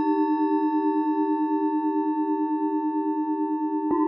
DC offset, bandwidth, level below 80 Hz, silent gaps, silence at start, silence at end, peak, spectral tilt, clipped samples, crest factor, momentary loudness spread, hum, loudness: under 0.1%; 4.1 kHz; -72 dBFS; none; 0 s; 0 s; -12 dBFS; -9 dB/octave; under 0.1%; 12 dB; 3 LU; none; -25 LUFS